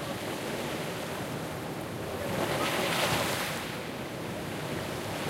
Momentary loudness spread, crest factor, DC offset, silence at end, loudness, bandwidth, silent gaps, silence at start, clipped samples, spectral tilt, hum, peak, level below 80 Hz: 9 LU; 18 dB; under 0.1%; 0 s; -32 LUFS; 16 kHz; none; 0 s; under 0.1%; -4 dB/octave; none; -16 dBFS; -56 dBFS